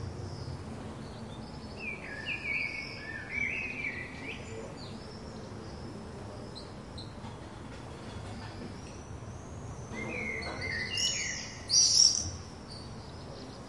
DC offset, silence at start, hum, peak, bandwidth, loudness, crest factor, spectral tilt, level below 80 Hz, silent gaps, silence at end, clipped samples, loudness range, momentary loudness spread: under 0.1%; 0 s; none; -10 dBFS; 11.5 kHz; -31 LUFS; 26 dB; -1.5 dB/octave; -54 dBFS; none; 0 s; under 0.1%; 16 LU; 17 LU